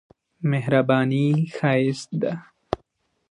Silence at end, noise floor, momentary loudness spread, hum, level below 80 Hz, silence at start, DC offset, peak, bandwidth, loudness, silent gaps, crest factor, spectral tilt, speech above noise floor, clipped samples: 0.55 s; -68 dBFS; 13 LU; none; -58 dBFS; 0.4 s; under 0.1%; -4 dBFS; 10.5 kHz; -23 LUFS; none; 18 dB; -7.5 dB/octave; 46 dB; under 0.1%